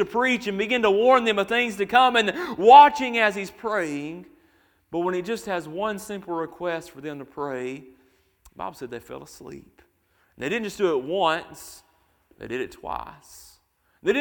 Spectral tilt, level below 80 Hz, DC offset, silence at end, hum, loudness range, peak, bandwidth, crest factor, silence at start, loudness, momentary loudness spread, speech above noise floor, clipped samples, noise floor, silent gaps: -4 dB/octave; -60 dBFS; under 0.1%; 0 s; none; 17 LU; 0 dBFS; 19 kHz; 24 dB; 0 s; -22 LUFS; 22 LU; 43 dB; under 0.1%; -66 dBFS; none